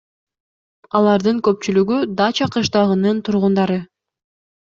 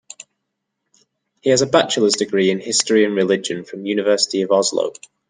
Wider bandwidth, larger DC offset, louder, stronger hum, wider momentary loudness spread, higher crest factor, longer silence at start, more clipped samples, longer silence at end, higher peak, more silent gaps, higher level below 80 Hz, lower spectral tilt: second, 7.4 kHz vs 10 kHz; neither; about the same, -17 LUFS vs -17 LUFS; neither; second, 3 LU vs 11 LU; about the same, 16 dB vs 18 dB; first, 0.95 s vs 0.2 s; neither; first, 0.8 s vs 0.4 s; about the same, -2 dBFS vs -2 dBFS; neither; first, -56 dBFS vs -66 dBFS; first, -6 dB/octave vs -3 dB/octave